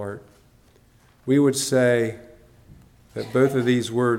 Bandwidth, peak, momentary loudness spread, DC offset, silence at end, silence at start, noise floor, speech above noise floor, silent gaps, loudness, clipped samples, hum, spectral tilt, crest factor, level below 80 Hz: 16.5 kHz; -6 dBFS; 18 LU; under 0.1%; 0 s; 0 s; -56 dBFS; 35 dB; none; -21 LUFS; under 0.1%; none; -5.5 dB/octave; 16 dB; -60 dBFS